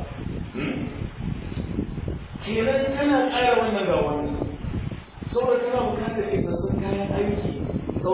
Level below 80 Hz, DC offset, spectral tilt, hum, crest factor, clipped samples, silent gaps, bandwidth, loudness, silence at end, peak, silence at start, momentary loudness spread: -38 dBFS; under 0.1%; -11 dB/octave; none; 16 dB; under 0.1%; none; 4 kHz; -25 LUFS; 0 s; -8 dBFS; 0 s; 12 LU